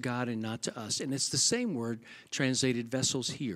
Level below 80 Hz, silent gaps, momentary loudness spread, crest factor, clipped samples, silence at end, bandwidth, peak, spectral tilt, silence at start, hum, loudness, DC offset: -70 dBFS; none; 10 LU; 18 dB; under 0.1%; 0 s; 15.5 kHz; -14 dBFS; -3 dB/octave; 0 s; none; -31 LUFS; under 0.1%